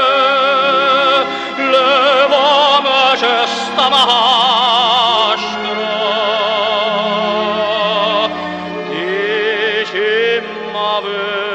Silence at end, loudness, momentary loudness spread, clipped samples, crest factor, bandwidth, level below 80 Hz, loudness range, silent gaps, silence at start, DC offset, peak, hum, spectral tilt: 0 s; -13 LUFS; 8 LU; under 0.1%; 14 dB; 10 kHz; -58 dBFS; 5 LU; none; 0 s; under 0.1%; 0 dBFS; none; -3 dB/octave